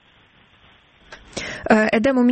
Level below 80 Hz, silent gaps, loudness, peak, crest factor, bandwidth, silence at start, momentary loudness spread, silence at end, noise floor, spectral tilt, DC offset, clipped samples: -50 dBFS; none; -19 LUFS; -2 dBFS; 20 dB; 8.8 kHz; 1.1 s; 15 LU; 0 s; -54 dBFS; -5.5 dB/octave; under 0.1%; under 0.1%